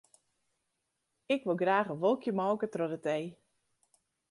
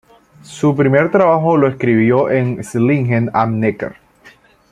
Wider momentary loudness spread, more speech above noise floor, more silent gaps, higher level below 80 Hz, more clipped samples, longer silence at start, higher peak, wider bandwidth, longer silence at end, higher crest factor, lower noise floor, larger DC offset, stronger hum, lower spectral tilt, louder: about the same, 6 LU vs 7 LU; first, 51 dB vs 33 dB; neither; second, -82 dBFS vs -52 dBFS; neither; first, 1.3 s vs 0.5 s; second, -16 dBFS vs -2 dBFS; about the same, 11.5 kHz vs 12.5 kHz; first, 1 s vs 0.45 s; about the same, 18 dB vs 14 dB; first, -83 dBFS vs -46 dBFS; neither; neither; second, -6.5 dB/octave vs -8 dB/octave; second, -32 LUFS vs -14 LUFS